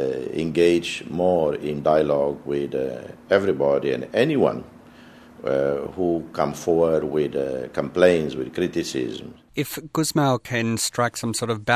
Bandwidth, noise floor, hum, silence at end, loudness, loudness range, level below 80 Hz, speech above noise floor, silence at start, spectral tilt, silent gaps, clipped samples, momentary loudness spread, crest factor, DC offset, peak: 15.5 kHz; -47 dBFS; none; 0 s; -23 LUFS; 2 LU; -52 dBFS; 24 dB; 0 s; -5 dB/octave; none; under 0.1%; 9 LU; 20 dB; under 0.1%; -2 dBFS